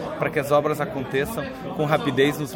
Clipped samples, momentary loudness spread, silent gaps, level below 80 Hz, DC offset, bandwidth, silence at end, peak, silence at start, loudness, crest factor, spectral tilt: under 0.1%; 7 LU; none; -50 dBFS; under 0.1%; 17 kHz; 0 s; -4 dBFS; 0 s; -23 LUFS; 20 dB; -5.5 dB/octave